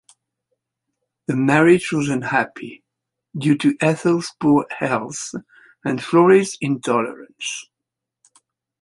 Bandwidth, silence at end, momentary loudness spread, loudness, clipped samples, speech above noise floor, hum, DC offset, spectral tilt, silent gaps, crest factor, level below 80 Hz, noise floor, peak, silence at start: 11.5 kHz; 1.2 s; 17 LU; -19 LUFS; under 0.1%; 65 dB; none; under 0.1%; -5.5 dB/octave; none; 18 dB; -62 dBFS; -84 dBFS; -2 dBFS; 1.3 s